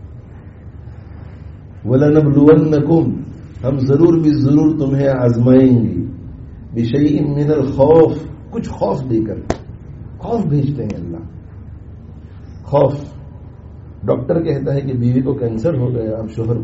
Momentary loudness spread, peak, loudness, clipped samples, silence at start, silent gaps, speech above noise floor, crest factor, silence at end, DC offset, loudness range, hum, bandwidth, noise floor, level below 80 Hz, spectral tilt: 25 LU; 0 dBFS; -15 LUFS; under 0.1%; 0 s; none; 21 dB; 16 dB; 0 s; under 0.1%; 9 LU; none; 7.8 kHz; -35 dBFS; -38 dBFS; -9.5 dB/octave